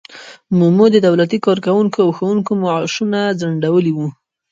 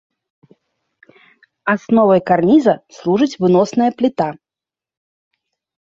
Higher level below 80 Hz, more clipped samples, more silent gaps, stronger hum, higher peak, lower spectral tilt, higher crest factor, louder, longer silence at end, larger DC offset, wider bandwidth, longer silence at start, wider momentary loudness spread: about the same, -60 dBFS vs -58 dBFS; neither; neither; neither; about the same, 0 dBFS vs 0 dBFS; about the same, -7 dB/octave vs -7 dB/octave; about the same, 14 dB vs 16 dB; about the same, -15 LUFS vs -15 LUFS; second, 0.4 s vs 1.55 s; neither; about the same, 7.6 kHz vs 7.6 kHz; second, 0.1 s vs 1.65 s; about the same, 8 LU vs 9 LU